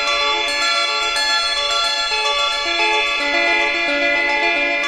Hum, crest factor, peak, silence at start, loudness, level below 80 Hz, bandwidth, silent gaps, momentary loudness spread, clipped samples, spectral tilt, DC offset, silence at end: none; 12 dB; -4 dBFS; 0 s; -16 LUFS; -48 dBFS; 13.5 kHz; none; 2 LU; under 0.1%; 0.5 dB/octave; under 0.1%; 0 s